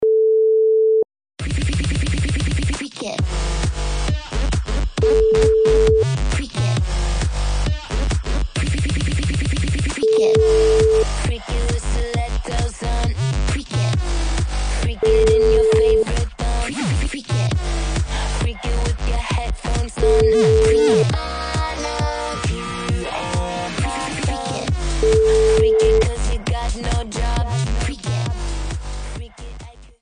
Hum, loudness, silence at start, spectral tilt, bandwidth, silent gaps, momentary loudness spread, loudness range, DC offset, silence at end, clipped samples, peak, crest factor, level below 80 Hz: none; -19 LUFS; 0 s; -5.5 dB/octave; 10 kHz; none; 9 LU; 5 LU; under 0.1%; 0.15 s; under 0.1%; -6 dBFS; 12 dB; -24 dBFS